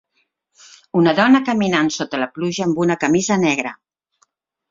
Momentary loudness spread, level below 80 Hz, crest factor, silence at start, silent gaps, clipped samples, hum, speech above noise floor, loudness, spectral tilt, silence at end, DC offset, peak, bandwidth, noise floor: 9 LU; -58 dBFS; 18 dB; 0.95 s; none; under 0.1%; none; 51 dB; -17 LUFS; -5 dB/octave; 0.95 s; under 0.1%; 0 dBFS; 7.8 kHz; -68 dBFS